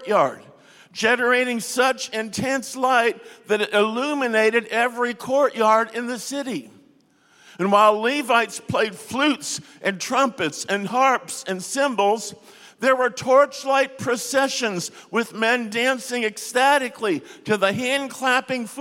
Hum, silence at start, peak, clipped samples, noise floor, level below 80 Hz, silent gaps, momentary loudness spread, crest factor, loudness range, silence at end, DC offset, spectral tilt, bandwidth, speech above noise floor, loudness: none; 0 s; -4 dBFS; under 0.1%; -58 dBFS; -70 dBFS; none; 9 LU; 18 dB; 2 LU; 0 s; under 0.1%; -3 dB/octave; 16.5 kHz; 36 dB; -21 LUFS